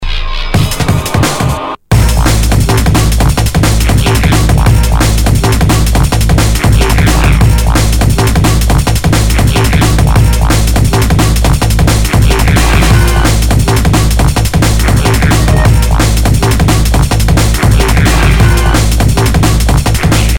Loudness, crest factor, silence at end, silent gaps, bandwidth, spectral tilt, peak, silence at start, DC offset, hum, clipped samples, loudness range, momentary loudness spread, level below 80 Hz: -9 LUFS; 8 dB; 0 s; none; 19 kHz; -5 dB/octave; 0 dBFS; 0 s; under 0.1%; none; 0.8%; 0 LU; 2 LU; -10 dBFS